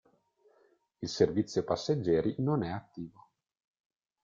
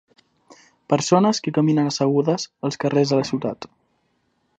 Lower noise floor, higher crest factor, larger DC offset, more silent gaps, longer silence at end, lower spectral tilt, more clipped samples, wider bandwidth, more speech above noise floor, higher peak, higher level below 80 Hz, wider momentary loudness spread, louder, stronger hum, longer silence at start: about the same, -69 dBFS vs -68 dBFS; about the same, 22 dB vs 20 dB; neither; neither; first, 1.15 s vs 0.9 s; about the same, -6.5 dB/octave vs -5.5 dB/octave; neither; second, 7.6 kHz vs 9.2 kHz; second, 38 dB vs 48 dB; second, -12 dBFS vs -2 dBFS; about the same, -64 dBFS vs -66 dBFS; first, 16 LU vs 10 LU; second, -31 LUFS vs -20 LUFS; neither; about the same, 1 s vs 0.9 s